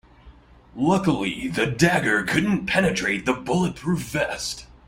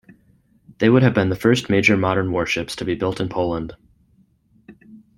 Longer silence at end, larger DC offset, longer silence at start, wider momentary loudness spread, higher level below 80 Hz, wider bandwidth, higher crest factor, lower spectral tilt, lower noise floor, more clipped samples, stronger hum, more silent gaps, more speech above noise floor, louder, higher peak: about the same, 0.15 s vs 0.2 s; neither; second, 0.25 s vs 0.8 s; about the same, 7 LU vs 9 LU; about the same, -48 dBFS vs -50 dBFS; about the same, 16 kHz vs 16 kHz; about the same, 20 dB vs 18 dB; about the same, -5 dB/octave vs -6 dB/octave; second, -49 dBFS vs -58 dBFS; neither; neither; neither; second, 27 dB vs 40 dB; second, -22 LUFS vs -19 LUFS; about the same, -4 dBFS vs -2 dBFS